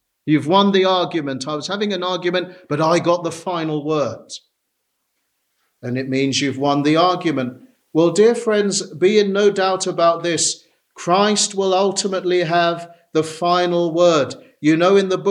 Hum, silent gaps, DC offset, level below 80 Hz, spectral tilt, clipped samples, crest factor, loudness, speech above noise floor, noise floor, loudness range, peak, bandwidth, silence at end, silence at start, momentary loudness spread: none; none; under 0.1%; -68 dBFS; -4 dB/octave; under 0.1%; 16 dB; -18 LUFS; 56 dB; -73 dBFS; 6 LU; -2 dBFS; 11.5 kHz; 0 s; 0.25 s; 10 LU